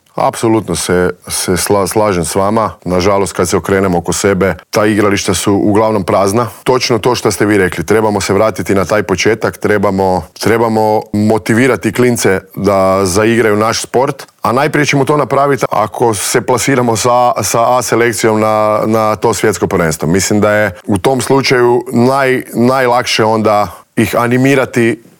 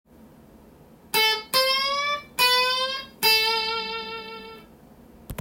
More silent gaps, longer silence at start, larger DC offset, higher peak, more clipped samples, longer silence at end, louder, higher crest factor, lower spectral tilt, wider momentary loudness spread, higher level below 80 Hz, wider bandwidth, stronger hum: neither; second, 0.15 s vs 1.15 s; neither; first, 0 dBFS vs -6 dBFS; neither; first, 0.2 s vs 0.05 s; first, -11 LUFS vs -21 LUFS; second, 10 dB vs 20 dB; first, -4.5 dB/octave vs -0.5 dB/octave; second, 4 LU vs 18 LU; first, -46 dBFS vs -56 dBFS; first, over 20 kHz vs 16.5 kHz; neither